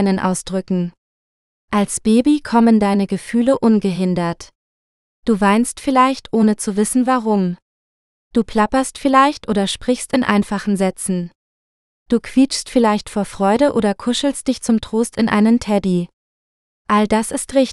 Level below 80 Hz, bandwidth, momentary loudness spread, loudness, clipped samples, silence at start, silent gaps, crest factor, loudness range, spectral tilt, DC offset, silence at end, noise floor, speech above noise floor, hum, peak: -46 dBFS; 13 kHz; 8 LU; -17 LUFS; under 0.1%; 0 s; 0.98-1.68 s, 4.55-5.23 s, 7.62-8.31 s, 11.35-12.06 s, 16.13-16.85 s; 16 dB; 2 LU; -5 dB/octave; under 0.1%; 0 s; under -90 dBFS; over 74 dB; none; 0 dBFS